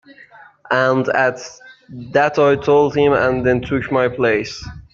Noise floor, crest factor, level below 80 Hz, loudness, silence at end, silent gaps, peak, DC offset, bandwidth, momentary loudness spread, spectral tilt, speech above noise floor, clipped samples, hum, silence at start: -44 dBFS; 14 dB; -46 dBFS; -16 LUFS; 0.1 s; none; -2 dBFS; under 0.1%; 7.4 kHz; 18 LU; -6 dB/octave; 28 dB; under 0.1%; none; 0.7 s